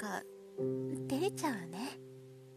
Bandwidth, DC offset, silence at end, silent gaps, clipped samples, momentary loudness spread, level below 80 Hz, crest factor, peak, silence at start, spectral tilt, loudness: 14 kHz; under 0.1%; 0 s; none; under 0.1%; 16 LU; -78 dBFS; 16 dB; -22 dBFS; 0 s; -5 dB/octave; -39 LUFS